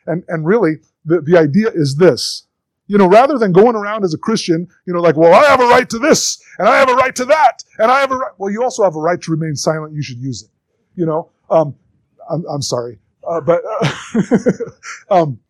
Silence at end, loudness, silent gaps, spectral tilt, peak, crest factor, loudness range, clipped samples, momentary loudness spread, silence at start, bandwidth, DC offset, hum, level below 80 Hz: 0.15 s; -14 LUFS; none; -5 dB/octave; 0 dBFS; 14 dB; 9 LU; under 0.1%; 14 LU; 0.05 s; 14.5 kHz; under 0.1%; none; -54 dBFS